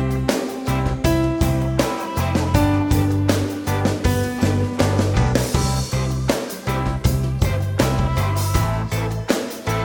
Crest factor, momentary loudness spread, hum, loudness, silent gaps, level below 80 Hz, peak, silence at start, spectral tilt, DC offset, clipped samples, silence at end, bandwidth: 18 dB; 5 LU; none; -20 LUFS; none; -28 dBFS; -2 dBFS; 0 s; -6 dB/octave; under 0.1%; under 0.1%; 0 s; over 20 kHz